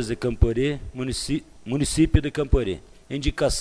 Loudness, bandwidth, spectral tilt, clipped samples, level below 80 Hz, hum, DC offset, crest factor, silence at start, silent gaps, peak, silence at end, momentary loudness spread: -25 LUFS; 11 kHz; -5.5 dB/octave; under 0.1%; -30 dBFS; none; under 0.1%; 20 dB; 0 s; none; -4 dBFS; 0 s; 10 LU